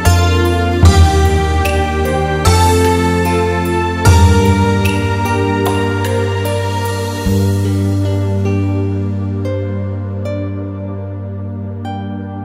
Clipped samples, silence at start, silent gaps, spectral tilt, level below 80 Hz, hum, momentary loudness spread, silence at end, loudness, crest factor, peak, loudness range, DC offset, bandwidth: under 0.1%; 0 s; none; -6 dB/octave; -22 dBFS; none; 13 LU; 0 s; -14 LUFS; 14 dB; 0 dBFS; 7 LU; under 0.1%; 15.5 kHz